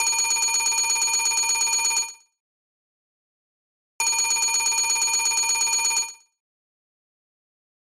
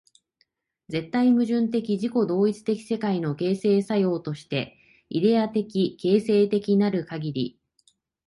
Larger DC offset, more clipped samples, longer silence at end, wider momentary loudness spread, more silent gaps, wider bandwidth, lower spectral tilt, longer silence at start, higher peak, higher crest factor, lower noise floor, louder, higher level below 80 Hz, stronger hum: neither; neither; first, 1.85 s vs 0.75 s; second, 4 LU vs 10 LU; first, 2.40-3.99 s vs none; first, 17.5 kHz vs 11.5 kHz; second, 4 dB/octave vs -7.5 dB/octave; second, 0 s vs 0.9 s; about the same, -10 dBFS vs -8 dBFS; about the same, 14 dB vs 16 dB; first, under -90 dBFS vs -71 dBFS; first, -20 LUFS vs -24 LUFS; about the same, -64 dBFS vs -66 dBFS; neither